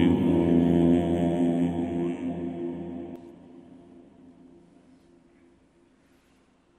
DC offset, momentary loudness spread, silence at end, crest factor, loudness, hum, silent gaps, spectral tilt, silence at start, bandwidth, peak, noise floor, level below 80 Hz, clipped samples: under 0.1%; 17 LU; 3 s; 18 dB; -25 LUFS; none; none; -9 dB/octave; 0 s; 8.8 kHz; -10 dBFS; -63 dBFS; -52 dBFS; under 0.1%